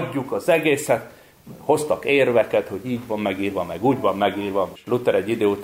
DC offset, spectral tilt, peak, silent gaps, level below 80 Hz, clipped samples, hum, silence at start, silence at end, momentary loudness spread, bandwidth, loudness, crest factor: under 0.1%; -5.5 dB/octave; -6 dBFS; none; -58 dBFS; under 0.1%; none; 0 s; 0 s; 7 LU; 16 kHz; -21 LUFS; 16 dB